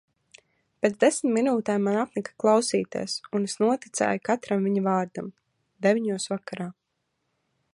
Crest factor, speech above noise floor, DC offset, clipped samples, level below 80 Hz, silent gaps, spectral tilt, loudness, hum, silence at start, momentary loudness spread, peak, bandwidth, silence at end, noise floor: 18 dB; 53 dB; under 0.1%; under 0.1%; -74 dBFS; none; -5 dB/octave; -25 LUFS; none; 0.85 s; 10 LU; -8 dBFS; 11.5 kHz; 1 s; -78 dBFS